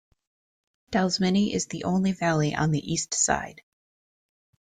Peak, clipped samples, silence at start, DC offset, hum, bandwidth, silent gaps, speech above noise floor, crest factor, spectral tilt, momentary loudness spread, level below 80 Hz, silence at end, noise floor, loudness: -8 dBFS; under 0.1%; 0.9 s; under 0.1%; none; 9.6 kHz; none; over 65 dB; 20 dB; -4.5 dB/octave; 6 LU; -54 dBFS; 1.1 s; under -90 dBFS; -25 LUFS